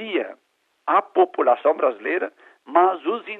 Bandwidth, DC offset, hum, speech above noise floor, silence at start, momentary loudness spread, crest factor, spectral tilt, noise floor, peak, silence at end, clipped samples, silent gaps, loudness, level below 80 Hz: 4 kHz; under 0.1%; none; 47 dB; 0 s; 11 LU; 18 dB; -6 dB/octave; -68 dBFS; -2 dBFS; 0 s; under 0.1%; none; -21 LUFS; -76 dBFS